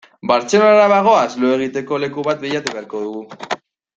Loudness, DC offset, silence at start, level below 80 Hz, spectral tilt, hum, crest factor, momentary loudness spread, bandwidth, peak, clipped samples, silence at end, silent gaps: -16 LUFS; under 0.1%; 0.25 s; -62 dBFS; -4.5 dB/octave; none; 16 dB; 16 LU; 8.2 kHz; 0 dBFS; under 0.1%; 0.4 s; none